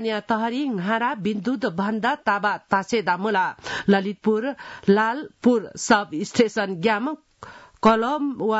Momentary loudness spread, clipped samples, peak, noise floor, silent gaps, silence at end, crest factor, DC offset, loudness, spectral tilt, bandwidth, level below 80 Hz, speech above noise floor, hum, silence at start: 6 LU; under 0.1%; -6 dBFS; -44 dBFS; none; 0 s; 18 dB; under 0.1%; -23 LUFS; -5 dB/octave; 8 kHz; -60 dBFS; 22 dB; none; 0 s